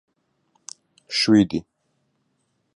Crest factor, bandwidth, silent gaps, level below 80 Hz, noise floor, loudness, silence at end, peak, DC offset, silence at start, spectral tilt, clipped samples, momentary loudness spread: 20 dB; 11.5 kHz; none; -56 dBFS; -71 dBFS; -20 LUFS; 1.15 s; -6 dBFS; under 0.1%; 1.1 s; -4.5 dB/octave; under 0.1%; 24 LU